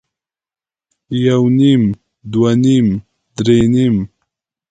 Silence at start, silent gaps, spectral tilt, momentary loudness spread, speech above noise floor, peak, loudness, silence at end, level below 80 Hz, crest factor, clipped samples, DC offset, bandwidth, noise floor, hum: 1.1 s; none; -7.5 dB/octave; 13 LU; 68 dB; 0 dBFS; -14 LUFS; 0.65 s; -44 dBFS; 14 dB; under 0.1%; under 0.1%; 9.2 kHz; -80 dBFS; none